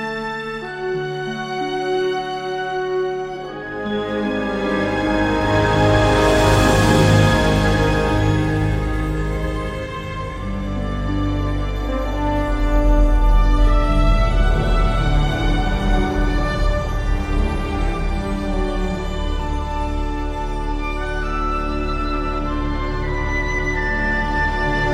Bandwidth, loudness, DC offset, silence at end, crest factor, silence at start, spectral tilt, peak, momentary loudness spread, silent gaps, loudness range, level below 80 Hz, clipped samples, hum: 13 kHz; -20 LUFS; under 0.1%; 0 s; 16 dB; 0 s; -6 dB/octave; -2 dBFS; 10 LU; none; 8 LU; -22 dBFS; under 0.1%; none